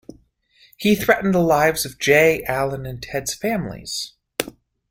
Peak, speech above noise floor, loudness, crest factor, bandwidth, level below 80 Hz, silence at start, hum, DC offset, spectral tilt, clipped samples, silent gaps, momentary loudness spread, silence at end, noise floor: 0 dBFS; 37 dB; -20 LUFS; 20 dB; 17 kHz; -48 dBFS; 0.8 s; none; under 0.1%; -4.5 dB/octave; under 0.1%; none; 13 LU; 0.4 s; -57 dBFS